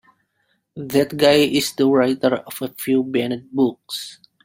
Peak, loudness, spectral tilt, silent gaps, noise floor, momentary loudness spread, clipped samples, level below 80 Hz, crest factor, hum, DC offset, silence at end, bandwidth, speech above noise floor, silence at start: -2 dBFS; -19 LUFS; -4.5 dB/octave; none; -68 dBFS; 14 LU; under 0.1%; -58 dBFS; 18 dB; none; under 0.1%; 0.3 s; 16.5 kHz; 49 dB; 0.75 s